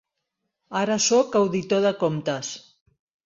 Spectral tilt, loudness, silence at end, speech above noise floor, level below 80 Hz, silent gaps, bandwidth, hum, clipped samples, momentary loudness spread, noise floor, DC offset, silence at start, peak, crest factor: -4 dB/octave; -23 LUFS; 0.65 s; 58 dB; -66 dBFS; none; 7.8 kHz; none; under 0.1%; 12 LU; -80 dBFS; under 0.1%; 0.7 s; -8 dBFS; 16 dB